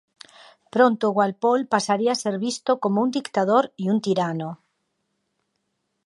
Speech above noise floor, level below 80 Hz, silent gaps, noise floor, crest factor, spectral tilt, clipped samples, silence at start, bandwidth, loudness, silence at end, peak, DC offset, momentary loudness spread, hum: 54 dB; -76 dBFS; none; -75 dBFS; 20 dB; -5 dB/octave; under 0.1%; 0.75 s; 11.5 kHz; -22 LUFS; 1.55 s; -4 dBFS; under 0.1%; 6 LU; none